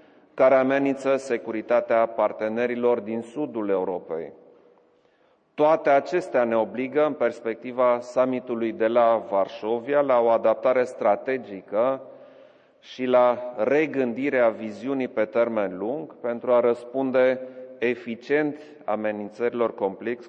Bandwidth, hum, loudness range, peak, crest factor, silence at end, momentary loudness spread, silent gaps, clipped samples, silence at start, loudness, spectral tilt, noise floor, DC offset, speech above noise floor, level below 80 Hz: 8.8 kHz; none; 3 LU; -8 dBFS; 16 dB; 0 s; 11 LU; none; under 0.1%; 0.35 s; -24 LUFS; -6.5 dB/octave; -63 dBFS; under 0.1%; 40 dB; -80 dBFS